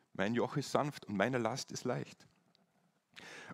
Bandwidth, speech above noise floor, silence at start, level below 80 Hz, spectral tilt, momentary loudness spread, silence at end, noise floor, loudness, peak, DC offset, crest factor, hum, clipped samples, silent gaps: 16 kHz; 39 dB; 0.2 s; -78 dBFS; -5 dB/octave; 17 LU; 0 s; -76 dBFS; -37 LUFS; -14 dBFS; under 0.1%; 24 dB; none; under 0.1%; none